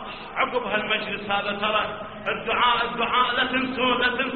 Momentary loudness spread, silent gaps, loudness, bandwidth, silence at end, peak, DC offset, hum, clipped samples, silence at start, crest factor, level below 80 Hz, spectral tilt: 8 LU; none; -23 LUFS; 4.6 kHz; 0 s; -8 dBFS; 0.2%; none; under 0.1%; 0 s; 18 dB; -52 dBFS; -0.5 dB/octave